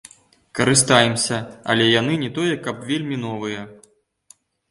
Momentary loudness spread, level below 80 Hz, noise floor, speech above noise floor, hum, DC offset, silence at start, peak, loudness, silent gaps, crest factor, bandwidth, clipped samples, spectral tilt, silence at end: 14 LU; -56 dBFS; -57 dBFS; 37 dB; none; under 0.1%; 0.55 s; 0 dBFS; -19 LUFS; none; 22 dB; 11.5 kHz; under 0.1%; -3.5 dB/octave; 0.95 s